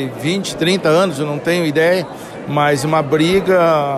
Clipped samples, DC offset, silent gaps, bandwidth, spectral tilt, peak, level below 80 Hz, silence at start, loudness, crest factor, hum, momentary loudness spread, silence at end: under 0.1%; under 0.1%; none; 14.5 kHz; -5.5 dB/octave; -4 dBFS; -48 dBFS; 0 s; -15 LUFS; 12 dB; none; 7 LU; 0 s